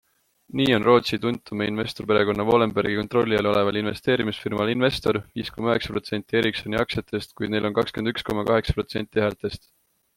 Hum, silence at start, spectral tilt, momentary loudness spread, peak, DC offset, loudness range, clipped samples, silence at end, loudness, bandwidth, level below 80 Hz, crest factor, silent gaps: none; 0.55 s; -6 dB/octave; 8 LU; -4 dBFS; under 0.1%; 4 LU; under 0.1%; 0.6 s; -24 LUFS; 16.5 kHz; -46 dBFS; 20 dB; none